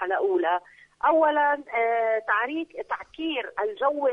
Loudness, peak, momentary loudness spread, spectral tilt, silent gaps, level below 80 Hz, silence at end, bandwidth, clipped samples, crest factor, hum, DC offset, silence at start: -25 LUFS; -10 dBFS; 10 LU; -4.5 dB/octave; none; -68 dBFS; 0 s; 6.2 kHz; under 0.1%; 16 dB; none; under 0.1%; 0 s